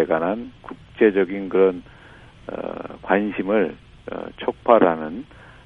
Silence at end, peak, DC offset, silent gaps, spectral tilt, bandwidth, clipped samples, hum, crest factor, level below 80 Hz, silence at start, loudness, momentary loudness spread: 0.15 s; 0 dBFS; under 0.1%; none; -8.5 dB/octave; 4.5 kHz; under 0.1%; none; 22 dB; -52 dBFS; 0 s; -21 LUFS; 21 LU